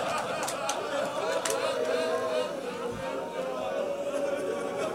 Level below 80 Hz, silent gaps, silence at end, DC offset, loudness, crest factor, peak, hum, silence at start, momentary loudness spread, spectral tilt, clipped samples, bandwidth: -66 dBFS; none; 0 s; under 0.1%; -31 LUFS; 20 dB; -10 dBFS; none; 0 s; 5 LU; -3 dB/octave; under 0.1%; 16 kHz